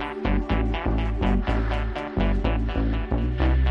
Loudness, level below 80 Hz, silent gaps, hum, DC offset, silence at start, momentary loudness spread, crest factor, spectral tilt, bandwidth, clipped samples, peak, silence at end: -25 LUFS; -24 dBFS; none; none; under 0.1%; 0 s; 3 LU; 16 dB; -8.5 dB/octave; 5.8 kHz; under 0.1%; -6 dBFS; 0 s